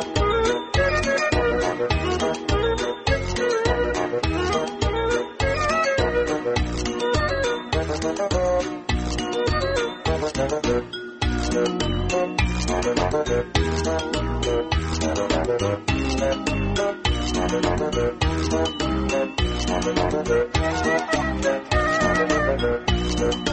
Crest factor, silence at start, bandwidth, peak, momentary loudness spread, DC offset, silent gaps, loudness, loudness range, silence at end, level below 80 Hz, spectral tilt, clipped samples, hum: 16 dB; 0 s; 8.8 kHz; -6 dBFS; 4 LU; under 0.1%; none; -23 LUFS; 2 LU; 0 s; -30 dBFS; -5 dB/octave; under 0.1%; none